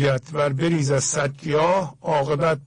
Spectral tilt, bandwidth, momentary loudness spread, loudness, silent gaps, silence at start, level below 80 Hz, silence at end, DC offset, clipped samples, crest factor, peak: -5 dB/octave; 10.5 kHz; 4 LU; -22 LUFS; none; 0 s; -52 dBFS; 0 s; under 0.1%; under 0.1%; 12 dB; -8 dBFS